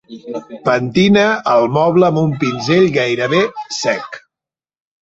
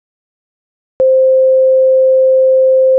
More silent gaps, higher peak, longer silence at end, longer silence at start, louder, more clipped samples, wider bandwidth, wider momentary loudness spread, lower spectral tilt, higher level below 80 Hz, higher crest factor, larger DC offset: neither; first, 0 dBFS vs -6 dBFS; first, 0.85 s vs 0 s; second, 0.1 s vs 1 s; second, -14 LUFS vs -9 LUFS; neither; first, 8 kHz vs 1 kHz; first, 15 LU vs 2 LU; second, -5.5 dB/octave vs -9.5 dB/octave; first, -52 dBFS vs -60 dBFS; first, 14 dB vs 4 dB; neither